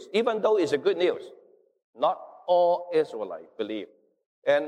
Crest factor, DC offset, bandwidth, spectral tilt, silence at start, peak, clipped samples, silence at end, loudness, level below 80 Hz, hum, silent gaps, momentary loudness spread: 14 dB; under 0.1%; 10.5 kHz; -5 dB/octave; 0 s; -12 dBFS; under 0.1%; 0 s; -26 LUFS; -82 dBFS; none; 1.84-1.93 s, 4.26-4.42 s; 13 LU